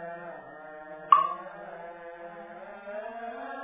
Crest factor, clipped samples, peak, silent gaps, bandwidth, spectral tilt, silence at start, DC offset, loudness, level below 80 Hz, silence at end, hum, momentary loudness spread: 28 dB; under 0.1%; -4 dBFS; none; 3.8 kHz; -1.5 dB/octave; 0 s; under 0.1%; -28 LUFS; -74 dBFS; 0 s; none; 21 LU